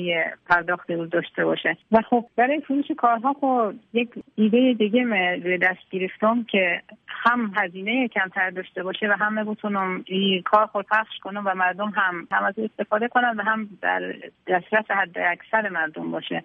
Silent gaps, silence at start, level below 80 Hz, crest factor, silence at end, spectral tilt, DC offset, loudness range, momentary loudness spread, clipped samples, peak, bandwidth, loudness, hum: none; 0 s; -66 dBFS; 18 dB; 0.05 s; -7.5 dB/octave; under 0.1%; 2 LU; 7 LU; under 0.1%; -6 dBFS; 5.2 kHz; -23 LUFS; none